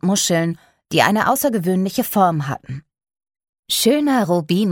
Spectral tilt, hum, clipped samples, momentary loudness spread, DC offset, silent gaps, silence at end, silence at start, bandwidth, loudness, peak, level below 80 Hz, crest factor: -4.5 dB/octave; none; under 0.1%; 12 LU; under 0.1%; 3.49-3.53 s, 3.59-3.63 s; 0 s; 0.05 s; 19.5 kHz; -18 LUFS; -2 dBFS; -58 dBFS; 18 dB